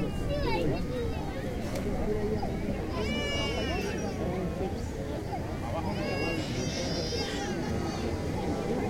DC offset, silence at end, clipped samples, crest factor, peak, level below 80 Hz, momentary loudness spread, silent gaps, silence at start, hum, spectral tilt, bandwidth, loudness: under 0.1%; 0 s; under 0.1%; 16 dB; -16 dBFS; -40 dBFS; 5 LU; none; 0 s; none; -5.5 dB/octave; 16 kHz; -32 LUFS